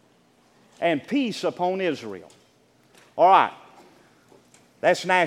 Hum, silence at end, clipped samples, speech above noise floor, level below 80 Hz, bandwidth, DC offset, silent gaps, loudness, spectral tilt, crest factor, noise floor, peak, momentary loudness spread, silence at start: none; 0 s; under 0.1%; 38 dB; -78 dBFS; 14.5 kHz; under 0.1%; none; -22 LUFS; -4.5 dB/octave; 22 dB; -60 dBFS; -4 dBFS; 18 LU; 0.8 s